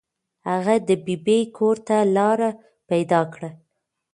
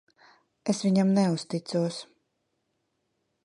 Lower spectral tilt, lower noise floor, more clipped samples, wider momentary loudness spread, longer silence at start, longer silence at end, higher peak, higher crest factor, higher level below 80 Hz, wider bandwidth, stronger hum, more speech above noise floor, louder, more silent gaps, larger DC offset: about the same, -6.5 dB/octave vs -6.5 dB/octave; about the same, -75 dBFS vs -77 dBFS; neither; about the same, 10 LU vs 11 LU; second, 0.45 s vs 0.65 s; second, 0.6 s vs 1.4 s; first, -4 dBFS vs -12 dBFS; about the same, 18 dB vs 18 dB; first, -68 dBFS vs -76 dBFS; about the same, 11 kHz vs 11 kHz; neither; about the same, 54 dB vs 52 dB; first, -21 LUFS vs -27 LUFS; neither; neither